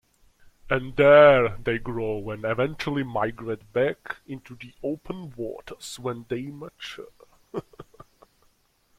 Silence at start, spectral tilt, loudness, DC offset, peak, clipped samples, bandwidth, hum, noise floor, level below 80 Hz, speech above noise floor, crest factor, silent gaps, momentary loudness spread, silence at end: 0.65 s; -6 dB/octave; -23 LUFS; under 0.1%; -2 dBFS; under 0.1%; 13 kHz; none; -65 dBFS; -50 dBFS; 41 dB; 22 dB; none; 22 LU; 1.15 s